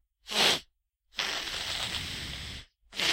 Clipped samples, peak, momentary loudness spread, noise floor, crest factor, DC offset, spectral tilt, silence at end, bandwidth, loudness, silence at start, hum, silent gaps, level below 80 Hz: under 0.1%; -10 dBFS; 16 LU; -70 dBFS; 24 dB; under 0.1%; -1 dB/octave; 0 s; 16 kHz; -30 LUFS; 0.25 s; none; none; -52 dBFS